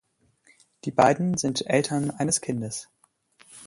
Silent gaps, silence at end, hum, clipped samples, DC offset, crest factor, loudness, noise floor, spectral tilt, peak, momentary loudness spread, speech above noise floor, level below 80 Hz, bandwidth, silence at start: none; 0 s; none; under 0.1%; under 0.1%; 22 dB; -24 LUFS; -62 dBFS; -4.5 dB/octave; -4 dBFS; 13 LU; 38 dB; -62 dBFS; 11.5 kHz; 0.85 s